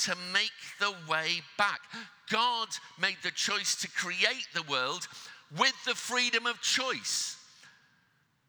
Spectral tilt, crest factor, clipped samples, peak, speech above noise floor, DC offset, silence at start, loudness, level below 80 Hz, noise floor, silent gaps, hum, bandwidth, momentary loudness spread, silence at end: -0.5 dB/octave; 24 dB; under 0.1%; -10 dBFS; 38 dB; under 0.1%; 0 s; -30 LUFS; -90 dBFS; -71 dBFS; none; none; over 20 kHz; 10 LU; 0.8 s